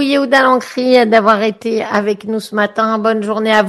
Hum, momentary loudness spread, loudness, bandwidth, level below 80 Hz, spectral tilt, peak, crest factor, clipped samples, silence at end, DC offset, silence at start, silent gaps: none; 8 LU; -13 LUFS; 12.5 kHz; -58 dBFS; -5 dB/octave; 0 dBFS; 12 dB; under 0.1%; 0 s; under 0.1%; 0 s; none